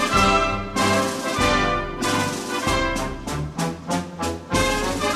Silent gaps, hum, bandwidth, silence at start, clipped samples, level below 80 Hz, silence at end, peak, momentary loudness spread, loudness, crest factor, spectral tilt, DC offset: none; none; 14.5 kHz; 0 s; under 0.1%; -36 dBFS; 0 s; -4 dBFS; 9 LU; -22 LUFS; 18 dB; -4 dB/octave; under 0.1%